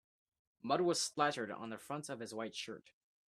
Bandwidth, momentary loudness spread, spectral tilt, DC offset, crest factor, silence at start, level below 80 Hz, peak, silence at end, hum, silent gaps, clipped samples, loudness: 14.5 kHz; 13 LU; -3.5 dB/octave; under 0.1%; 22 dB; 0.65 s; -84 dBFS; -18 dBFS; 0.5 s; none; none; under 0.1%; -39 LUFS